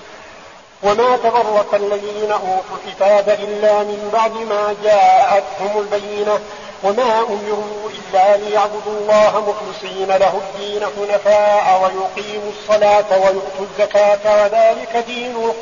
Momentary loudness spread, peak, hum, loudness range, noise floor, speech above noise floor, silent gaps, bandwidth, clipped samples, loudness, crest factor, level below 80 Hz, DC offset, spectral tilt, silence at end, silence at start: 10 LU; -4 dBFS; none; 2 LU; -39 dBFS; 24 dB; none; 7.4 kHz; under 0.1%; -16 LUFS; 12 dB; -54 dBFS; 0.2%; -1.5 dB/octave; 0 s; 0 s